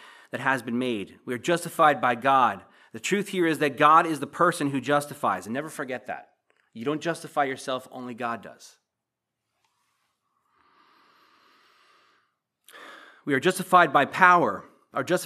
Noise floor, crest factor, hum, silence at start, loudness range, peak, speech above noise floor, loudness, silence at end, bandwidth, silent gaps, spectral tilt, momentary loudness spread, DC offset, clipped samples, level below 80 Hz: -85 dBFS; 26 dB; none; 0.35 s; 14 LU; -2 dBFS; 61 dB; -24 LUFS; 0 s; 15 kHz; none; -4.5 dB/octave; 18 LU; under 0.1%; under 0.1%; -82 dBFS